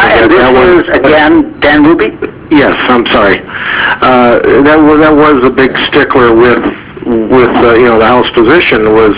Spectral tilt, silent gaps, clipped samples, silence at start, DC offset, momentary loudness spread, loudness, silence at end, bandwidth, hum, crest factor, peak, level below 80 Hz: -9 dB/octave; none; 4%; 0 s; under 0.1%; 6 LU; -5 LUFS; 0 s; 4 kHz; none; 6 dB; 0 dBFS; -30 dBFS